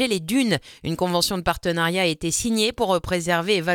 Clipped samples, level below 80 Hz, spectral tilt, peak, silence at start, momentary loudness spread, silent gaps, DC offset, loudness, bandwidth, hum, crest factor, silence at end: under 0.1%; -46 dBFS; -3.5 dB/octave; -6 dBFS; 0 s; 3 LU; none; under 0.1%; -22 LUFS; 18.5 kHz; none; 18 dB; 0 s